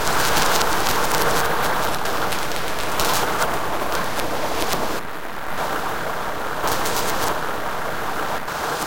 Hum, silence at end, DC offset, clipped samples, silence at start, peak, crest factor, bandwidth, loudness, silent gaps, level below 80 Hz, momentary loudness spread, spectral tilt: none; 0 s; 6%; under 0.1%; 0 s; 0 dBFS; 22 dB; 17.5 kHz; -22 LUFS; none; -40 dBFS; 7 LU; -2.5 dB/octave